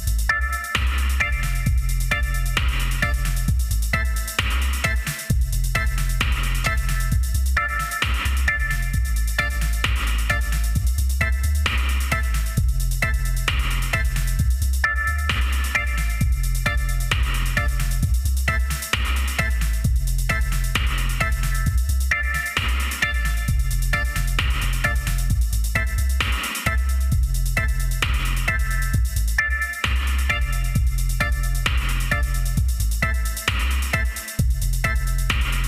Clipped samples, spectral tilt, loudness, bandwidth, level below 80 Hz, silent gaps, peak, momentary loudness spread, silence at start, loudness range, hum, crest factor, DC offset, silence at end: under 0.1%; -3.5 dB/octave; -23 LUFS; 16 kHz; -22 dBFS; none; -10 dBFS; 2 LU; 0 s; 1 LU; none; 12 dB; under 0.1%; 0 s